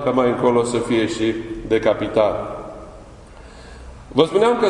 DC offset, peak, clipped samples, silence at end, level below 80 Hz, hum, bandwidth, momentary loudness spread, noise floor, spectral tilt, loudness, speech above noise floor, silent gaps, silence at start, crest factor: under 0.1%; 0 dBFS; under 0.1%; 0 s; -44 dBFS; none; 11 kHz; 23 LU; -41 dBFS; -5.5 dB/octave; -19 LUFS; 23 dB; none; 0 s; 20 dB